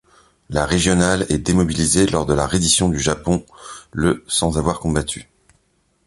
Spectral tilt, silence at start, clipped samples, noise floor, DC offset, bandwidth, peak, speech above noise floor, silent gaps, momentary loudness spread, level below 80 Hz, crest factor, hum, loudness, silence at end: -4 dB/octave; 0.5 s; under 0.1%; -63 dBFS; under 0.1%; 11.5 kHz; -2 dBFS; 45 dB; none; 10 LU; -34 dBFS; 18 dB; none; -18 LUFS; 0.85 s